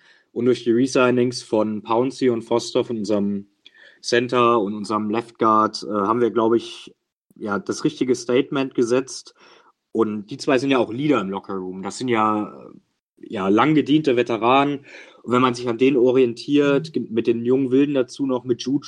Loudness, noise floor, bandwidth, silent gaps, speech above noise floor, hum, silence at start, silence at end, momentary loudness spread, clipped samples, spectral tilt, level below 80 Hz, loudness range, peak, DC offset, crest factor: -20 LUFS; -50 dBFS; 11 kHz; 7.13-7.30 s, 13.02-13.13 s; 30 dB; none; 0.35 s; 0 s; 11 LU; under 0.1%; -5.5 dB/octave; -68 dBFS; 4 LU; -2 dBFS; under 0.1%; 18 dB